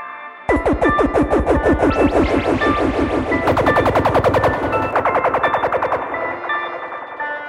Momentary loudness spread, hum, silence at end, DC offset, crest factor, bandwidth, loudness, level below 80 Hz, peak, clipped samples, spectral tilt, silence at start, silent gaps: 8 LU; none; 0 s; under 0.1%; 14 dB; 16 kHz; -17 LUFS; -32 dBFS; -2 dBFS; under 0.1%; -7 dB/octave; 0 s; none